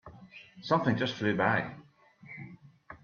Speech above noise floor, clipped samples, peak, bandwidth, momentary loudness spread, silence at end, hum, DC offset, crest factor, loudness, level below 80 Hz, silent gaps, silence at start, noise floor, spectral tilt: 25 dB; under 0.1%; -12 dBFS; 7 kHz; 23 LU; 0.05 s; none; under 0.1%; 22 dB; -29 LUFS; -68 dBFS; none; 0.05 s; -54 dBFS; -6.5 dB/octave